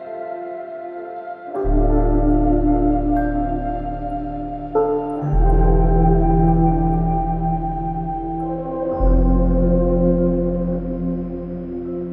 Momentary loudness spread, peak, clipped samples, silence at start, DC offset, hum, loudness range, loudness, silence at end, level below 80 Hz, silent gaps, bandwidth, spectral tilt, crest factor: 12 LU; -2 dBFS; under 0.1%; 0 s; under 0.1%; none; 2 LU; -20 LUFS; 0 s; -22 dBFS; none; 2.8 kHz; -12.5 dB/octave; 16 dB